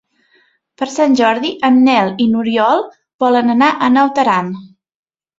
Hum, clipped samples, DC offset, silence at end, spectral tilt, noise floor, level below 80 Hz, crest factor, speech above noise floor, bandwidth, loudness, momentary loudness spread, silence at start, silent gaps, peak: none; under 0.1%; under 0.1%; 0.75 s; -5 dB/octave; -56 dBFS; -58 dBFS; 14 dB; 44 dB; 7.8 kHz; -13 LUFS; 11 LU; 0.8 s; 3.14-3.19 s; 0 dBFS